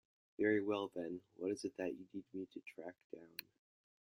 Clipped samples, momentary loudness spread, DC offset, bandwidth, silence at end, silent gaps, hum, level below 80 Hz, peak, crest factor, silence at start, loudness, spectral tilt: under 0.1%; 16 LU; under 0.1%; 15.5 kHz; 0.65 s; 3.04-3.10 s; none; -86 dBFS; -22 dBFS; 22 dB; 0.4 s; -43 LUFS; -5.5 dB/octave